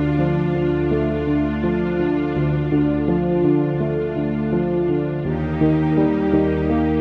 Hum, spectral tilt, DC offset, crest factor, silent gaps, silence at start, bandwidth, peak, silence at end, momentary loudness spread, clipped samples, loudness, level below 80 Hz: none; -10.5 dB/octave; under 0.1%; 14 dB; none; 0 s; 5.2 kHz; -4 dBFS; 0 s; 4 LU; under 0.1%; -20 LUFS; -34 dBFS